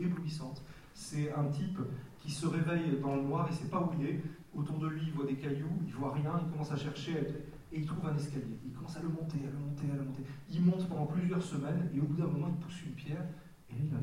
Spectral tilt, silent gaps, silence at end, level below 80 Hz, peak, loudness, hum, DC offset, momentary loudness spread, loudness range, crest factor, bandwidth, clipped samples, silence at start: -7.5 dB/octave; none; 0 s; -62 dBFS; -20 dBFS; -37 LUFS; none; under 0.1%; 11 LU; 4 LU; 16 dB; 12.5 kHz; under 0.1%; 0 s